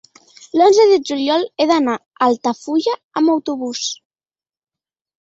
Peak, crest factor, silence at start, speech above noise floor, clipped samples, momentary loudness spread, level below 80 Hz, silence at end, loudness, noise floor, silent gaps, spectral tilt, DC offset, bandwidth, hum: -2 dBFS; 16 dB; 0.55 s; over 74 dB; under 0.1%; 11 LU; -64 dBFS; 1.25 s; -16 LUFS; under -90 dBFS; 2.06-2.11 s, 3.04-3.10 s; -3 dB/octave; under 0.1%; 8 kHz; none